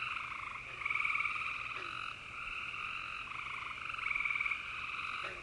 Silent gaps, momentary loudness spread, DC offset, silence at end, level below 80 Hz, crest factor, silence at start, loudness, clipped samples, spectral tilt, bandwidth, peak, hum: none; 8 LU; under 0.1%; 0 s; -64 dBFS; 18 dB; 0 s; -37 LUFS; under 0.1%; -2 dB/octave; 11.5 kHz; -22 dBFS; none